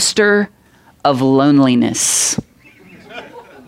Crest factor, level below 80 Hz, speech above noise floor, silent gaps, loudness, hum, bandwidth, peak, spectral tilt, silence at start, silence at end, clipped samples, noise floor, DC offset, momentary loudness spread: 16 dB; -54 dBFS; 33 dB; none; -13 LUFS; none; 16 kHz; 0 dBFS; -3.5 dB/octave; 0 s; 0.25 s; under 0.1%; -45 dBFS; under 0.1%; 22 LU